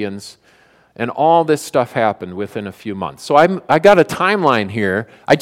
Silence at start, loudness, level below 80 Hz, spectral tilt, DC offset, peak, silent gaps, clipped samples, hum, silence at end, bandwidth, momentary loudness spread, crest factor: 0 s; -15 LUFS; -56 dBFS; -5.5 dB/octave; under 0.1%; 0 dBFS; none; 0.1%; none; 0 s; 16 kHz; 14 LU; 16 dB